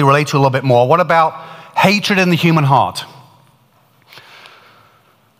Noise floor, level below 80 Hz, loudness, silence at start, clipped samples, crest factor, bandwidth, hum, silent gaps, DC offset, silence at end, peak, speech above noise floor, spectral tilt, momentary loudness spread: -53 dBFS; -60 dBFS; -13 LUFS; 0 s; under 0.1%; 14 dB; 16 kHz; none; none; under 0.1%; 2.35 s; 0 dBFS; 41 dB; -6 dB/octave; 11 LU